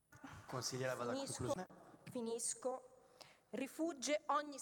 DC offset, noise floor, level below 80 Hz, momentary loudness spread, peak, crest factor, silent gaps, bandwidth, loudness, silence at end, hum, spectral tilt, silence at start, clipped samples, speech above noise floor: under 0.1%; -65 dBFS; -76 dBFS; 18 LU; -26 dBFS; 18 dB; none; 18 kHz; -43 LUFS; 0 s; none; -3.5 dB/octave; 0.1 s; under 0.1%; 22 dB